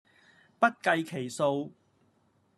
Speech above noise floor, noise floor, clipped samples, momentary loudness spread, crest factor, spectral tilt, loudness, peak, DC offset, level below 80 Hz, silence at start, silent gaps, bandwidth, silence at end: 40 dB; -69 dBFS; under 0.1%; 10 LU; 24 dB; -5 dB/octave; -29 LUFS; -8 dBFS; under 0.1%; -82 dBFS; 0.6 s; none; 13 kHz; 0.85 s